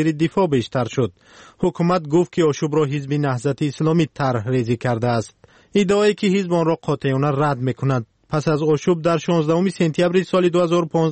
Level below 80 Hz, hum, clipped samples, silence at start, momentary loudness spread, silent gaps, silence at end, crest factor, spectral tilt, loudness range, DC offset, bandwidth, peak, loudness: -54 dBFS; none; under 0.1%; 0 s; 5 LU; none; 0 s; 12 dB; -7 dB/octave; 2 LU; under 0.1%; 8.8 kHz; -6 dBFS; -20 LUFS